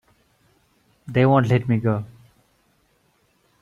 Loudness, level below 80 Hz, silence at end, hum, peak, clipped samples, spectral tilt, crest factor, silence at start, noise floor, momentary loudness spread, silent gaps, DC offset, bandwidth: -20 LUFS; -56 dBFS; 1.55 s; none; -4 dBFS; under 0.1%; -9 dB/octave; 20 dB; 1.05 s; -64 dBFS; 11 LU; none; under 0.1%; 7 kHz